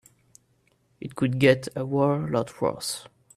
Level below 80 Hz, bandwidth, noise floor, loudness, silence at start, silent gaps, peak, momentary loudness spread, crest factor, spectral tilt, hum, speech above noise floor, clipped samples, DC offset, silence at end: -62 dBFS; 15 kHz; -67 dBFS; -25 LUFS; 1 s; none; -6 dBFS; 14 LU; 20 dB; -5.5 dB/octave; none; 42 dB; under 0.1%; under 0.1%; 0.35 s